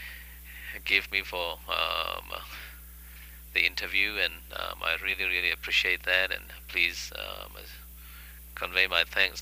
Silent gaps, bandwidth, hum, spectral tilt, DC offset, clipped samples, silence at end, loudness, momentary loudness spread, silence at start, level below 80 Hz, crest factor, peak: none; 16 kHz; none; -1.5 dB/octave; under 0.1%; under 0.1%; 0 s; -27 LUFS; 21 LU; 0 s; -48 dBFS; 24 dB; -6 dBFS